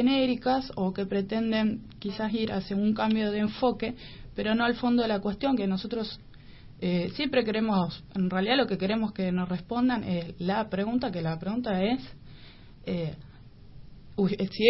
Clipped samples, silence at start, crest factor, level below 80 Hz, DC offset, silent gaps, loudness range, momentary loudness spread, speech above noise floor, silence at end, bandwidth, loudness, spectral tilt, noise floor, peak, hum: under 0.1%; 0 s; 22 dB; -52 dBFS; under 0.1%; none; 4 LU; 9 LU; 21 dB; 0 s; 5.8 kHz; -28 LUFS; -10 dB/octave; -48 dBFS; -8 dBFS; none